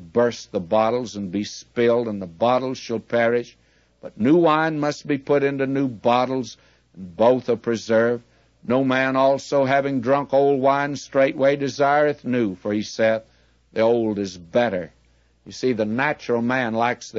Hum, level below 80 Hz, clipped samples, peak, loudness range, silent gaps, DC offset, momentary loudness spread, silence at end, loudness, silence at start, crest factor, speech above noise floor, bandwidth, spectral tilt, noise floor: none; -60 dBFS; under 0.1%; -4 dBFS; 4 LU; none; under 0.1%; 10 LU; 0 s; -21 LUFS; 0 s; 16 dB; 38 dB; 7.8 kHz; -6 dB/octave; -59 dBFS